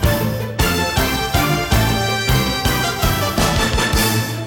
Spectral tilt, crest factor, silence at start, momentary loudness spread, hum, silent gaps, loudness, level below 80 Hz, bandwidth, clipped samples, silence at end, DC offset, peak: -4 dB/octave; 16 dB; 0 s; 2 LU; none; none; -17 LUFS; -26 dBFS; 18 kHz; under 0.1%; 0 s; under 0.1%; -2 dBFS